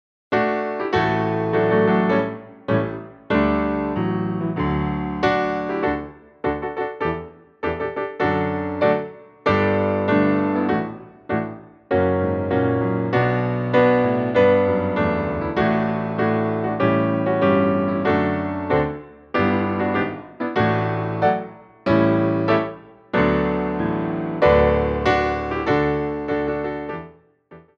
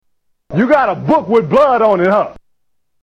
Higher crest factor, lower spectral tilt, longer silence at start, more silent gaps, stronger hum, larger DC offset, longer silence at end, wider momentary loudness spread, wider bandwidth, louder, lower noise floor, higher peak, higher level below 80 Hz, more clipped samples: about the same, 16 dB vs 12 dB; about the same, -8.5 dB/octave vs -8 dB/octave; second, 0.3 s vs 0.5 s; neither; neither; neither; second, 0.2 s vs 0.7 s; first, 10 LU vs 6 LU; second, 7 kHz vs 8.4 kHz; second, -21 LUFS vs -13 LUFS; second, -48 dBFS vs -70 dBFS; about the same, -4 dBFS vs -2 dBFS; first, -42 dBFS vs -48 dBFS; neither